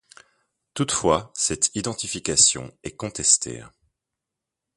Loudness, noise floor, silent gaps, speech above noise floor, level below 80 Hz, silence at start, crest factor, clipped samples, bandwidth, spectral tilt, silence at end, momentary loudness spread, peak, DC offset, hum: -21 LUFS; -85 dBFS; none; 62 dB; -52 dBFS; 0.75 s; 24 dB; under 0.1%; 11.5 kHz; -2 dB/octave; 1.1 s; 17 LU; -2 dBFS; under 0.1%; none